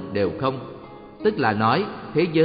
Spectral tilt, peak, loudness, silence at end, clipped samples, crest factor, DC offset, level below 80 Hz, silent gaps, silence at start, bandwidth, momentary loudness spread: -5 dB/octave; -6 dBFS; -23 LUFS; 0 s; under 0.1%; 16 dB; under 0.1%; -54 dBFS; none; 0 s; 5.2 kHz; 18 LU